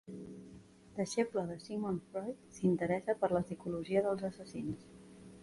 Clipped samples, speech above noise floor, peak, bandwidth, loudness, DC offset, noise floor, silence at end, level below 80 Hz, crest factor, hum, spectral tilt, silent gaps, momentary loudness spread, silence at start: under 0.1%; 21 dB; -18 dBFS; 11.5 kHz; -37 LUFS; under 0.1%; -57 dBFS; 0 s; -66 dBFS; 18 dB; none; -6.5 dB/octave; none; 18 LU; 0.05 s